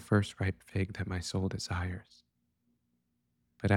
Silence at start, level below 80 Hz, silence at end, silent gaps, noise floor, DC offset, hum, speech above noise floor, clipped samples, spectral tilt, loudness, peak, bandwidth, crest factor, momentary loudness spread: 0 s; -56 dBFS; 0 s; none; -79 dBFS; under 0.1%; none; 45 dB; under 0.1%; -6 dB/octave; -35 LUFS; -12 dBFS; 12 kHz; 22 dB; 7 LU